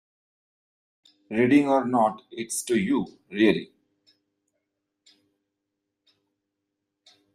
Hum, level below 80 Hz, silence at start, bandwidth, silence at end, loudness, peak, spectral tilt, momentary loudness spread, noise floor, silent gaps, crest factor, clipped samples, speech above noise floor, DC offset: none; -68 dBFS; 1.3 s; 15 kHz; 3.7 s; -24 LUFS; -8 dBFS; -5 dB/octave; 13 LU; -82 dBFS; none; 20 dB; under 0.1%; 59 dB; under 0.1%